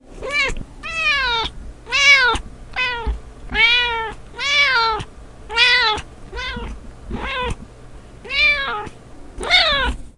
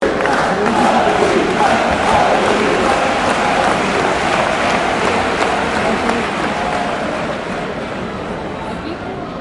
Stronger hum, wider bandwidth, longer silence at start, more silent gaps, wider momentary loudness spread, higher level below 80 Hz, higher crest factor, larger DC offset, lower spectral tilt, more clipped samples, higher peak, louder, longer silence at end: neither; about the same, 11.5 kHz vs 11.5 kHz; about the same, 0.1 s vs 0 s; neither; first, 18 LU vs 11 LU; about the same, -34 dBFS vs -38 dBFS; about the same, 20 dB vs 16 dB; neither; second, -2 dB/octave vs -4.5 dB/octave; neither; about the same, 0 dBFS vs 0 dBFS; about the same, -16 LUFS vs -15 LUFS; about the same, 0.1 s vs 0 s